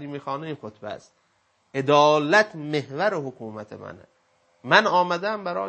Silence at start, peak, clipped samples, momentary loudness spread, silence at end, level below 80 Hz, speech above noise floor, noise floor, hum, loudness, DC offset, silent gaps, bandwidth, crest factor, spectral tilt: 0 s; 0 dBFS; under 0.1%; 21 LU; 0 s; -74 dBFS; 41 dB; -65 dBFS; none; -22 LUFS; under 0.1%; none; 8.6 kHz; 24 dB; -4.5 dB/octave